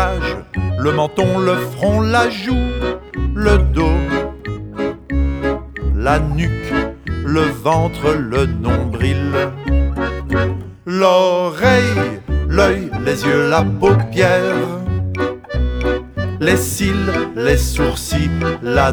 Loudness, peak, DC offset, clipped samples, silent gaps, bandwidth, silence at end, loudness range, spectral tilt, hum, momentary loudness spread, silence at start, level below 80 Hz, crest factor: -17 LUFS; 0 dBFS; under 0.1%; under 0.1%; none; over 20 kHz; 0 s; 4 LU; -6 dB/octave; none; 8 LU; 0 s; -24 dBFS; 16 dB